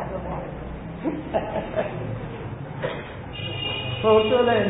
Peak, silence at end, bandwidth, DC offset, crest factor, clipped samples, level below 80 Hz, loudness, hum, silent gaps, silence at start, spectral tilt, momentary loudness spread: -6 dBFS; 0 s; 4 kHz; under 0.1%; 18 dB; under 0.1%; -44 dBFS; -26 LUFS; none; none; 0 s; -10.5 dB/octave; 15 LU